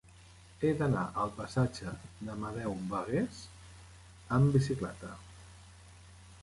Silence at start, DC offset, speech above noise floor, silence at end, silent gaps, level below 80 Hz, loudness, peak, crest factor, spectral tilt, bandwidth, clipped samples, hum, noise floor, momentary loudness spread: 0.2 s; under 0.1%; 24 dB; 0 s; none; -56 dBFS; -33 LUFS; -16 dBFS; 20 dB; -7.5 dB/octave; 11.5 kHz; under 0.1%; none; -56 dBFS; 26 LU